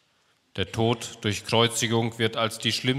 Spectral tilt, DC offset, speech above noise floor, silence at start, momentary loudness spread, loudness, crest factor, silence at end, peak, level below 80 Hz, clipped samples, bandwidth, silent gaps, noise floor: -4 dB/octave; under 0.1%; 41 dB; 0.55 s; 8 LU; -25 LUFS; 20 dB; 0 s; -6 dBFS; -60 dBFS; under 0.1%; 16 kHz; none; -67 dBFS